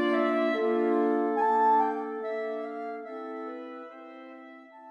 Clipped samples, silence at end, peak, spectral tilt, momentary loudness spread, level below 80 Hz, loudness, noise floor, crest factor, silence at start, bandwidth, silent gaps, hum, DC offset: under 0.1%; 0 s; -14 dBFS; -6 dB/octave; 22 LU; -80 dBFS; -28 LUFS; -48 dBFS; 14 dB; 0 s; 8.4 kHz; none; none; under 0.1%